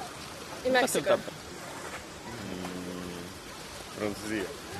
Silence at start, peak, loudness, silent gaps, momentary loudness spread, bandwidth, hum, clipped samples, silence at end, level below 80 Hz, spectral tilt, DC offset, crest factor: 0 s; -12 dBFS; -33 LUFS; none; 15 LU; 14 kHz; none; under 0.1%; 0 s; -58 dBFS; -3.5 dB/octave; under 0.1%; 22 dB